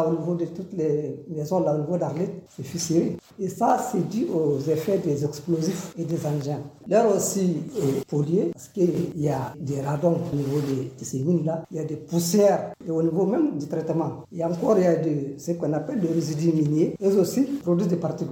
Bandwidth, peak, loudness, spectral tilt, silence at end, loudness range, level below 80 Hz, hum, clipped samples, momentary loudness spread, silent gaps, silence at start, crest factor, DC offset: 17 kHz; -8 dBFS; -25 LUFS; -7 dB/octave; 0 s; 3 LU; -64 dBFS; none; under 0.1%; 9 LU; none; 0 s; 16 dB; under 0.1%